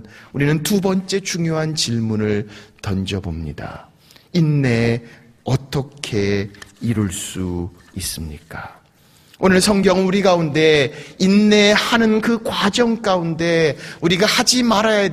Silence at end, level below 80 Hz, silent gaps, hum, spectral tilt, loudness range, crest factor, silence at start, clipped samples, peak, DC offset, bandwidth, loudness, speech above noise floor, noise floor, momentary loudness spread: 0 s; -44 dBFS; none; none; -4.5 dB/octave; 8 LU; 18 dB; 0.05 s; under 0.1%; 0 dBFS; under 0.1%; 15.5 kHz; -17 LUFS; 34 dB; -52 dBFS; 16 LU